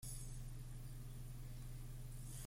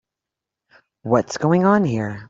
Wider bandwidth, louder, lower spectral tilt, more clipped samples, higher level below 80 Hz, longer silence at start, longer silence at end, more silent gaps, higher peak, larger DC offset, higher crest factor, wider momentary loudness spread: first, 16.5 kHz vs 7.8 kHz; second, -53 LUFS vs -18 LUFS; second, -4.5 dB/octave vs -7 dB/octave; neither; first, -52 dBFS vs -58 dBFS; second, 0 s vs 1.05 s; about the same, 0 s vs 0.05 s; neither; second, -38 dBFS vs -2 dBFS; neither; second, 12 dB vs 18 dB; second, 2 LU vs 7 LU